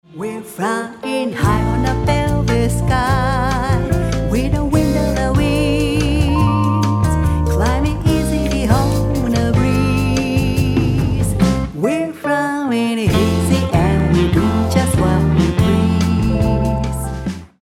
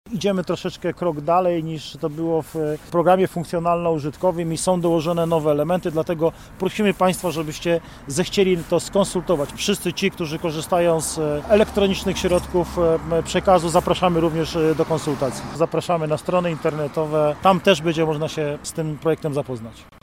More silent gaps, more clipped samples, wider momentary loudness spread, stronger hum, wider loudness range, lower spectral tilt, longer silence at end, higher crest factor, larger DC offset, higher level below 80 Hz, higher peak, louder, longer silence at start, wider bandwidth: neither; neither; second, 5 LU vs 8 LU; neither; about the same, 2 LU vs 2 LU; about the same, -6.5 dB/octave vs -5.5 dB/octave; about the same, 0.15 s vs 0.2 s; about the same, 14 dB vs 18 dB; second, under 0.1% vs 0.1%; first, -24 dBFS vs -44 dBFS; about the same, 0 dBFS vs -2 dBFS; first, -16 LUFS vs -21 LUFS; about the same, 0.1 s vs 0.05 s; about the same, 16.5 kHz vs 16.5 kHz